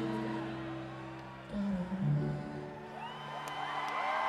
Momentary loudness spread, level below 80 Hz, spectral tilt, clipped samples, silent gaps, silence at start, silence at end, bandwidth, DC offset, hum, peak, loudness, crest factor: 11 LU; -60 dBFS; -7 dB/octave; under 0.1%; none; 0 s; 0 s; 13 kHz; under 0.1%; none; -20 dBFS; -38 LUFS; 16 dB